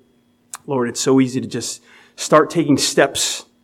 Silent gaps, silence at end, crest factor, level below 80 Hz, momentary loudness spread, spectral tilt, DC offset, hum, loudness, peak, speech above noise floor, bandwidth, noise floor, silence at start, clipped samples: none; 0.2 s; 18 dB; -60 dBFS; 14 LU; -3.5 dB/octave; under 0.1%; none; -17 LUFS; 0 dBFS; 41 dB; 16 kHz; -58 dBFS; 0.55 s; under 0.1%